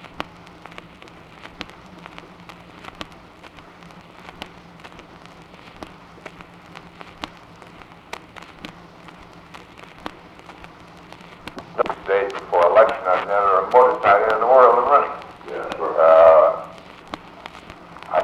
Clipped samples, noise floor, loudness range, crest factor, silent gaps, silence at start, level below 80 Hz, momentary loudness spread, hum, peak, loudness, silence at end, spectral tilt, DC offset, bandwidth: under 0.1%; -44 dBFS; 25 LU; 20 dB; none; 0.2 s; -56 dBFS; 28 LU; none; 0 dBFS; -16 LUFS; 0 s; -5 dB/octave; under 0.1%; 10 kHz